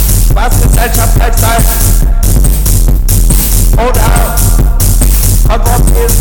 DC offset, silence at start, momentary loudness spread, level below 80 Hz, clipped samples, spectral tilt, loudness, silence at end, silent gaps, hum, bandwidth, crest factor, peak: under 0.1%; 0 s; 2 LU; -8 dBFS; 0.5%; -4.5 dB/octave; -9 LUFS; 0 s; none; none; 18 kHz; 6 dB; 0 dBFS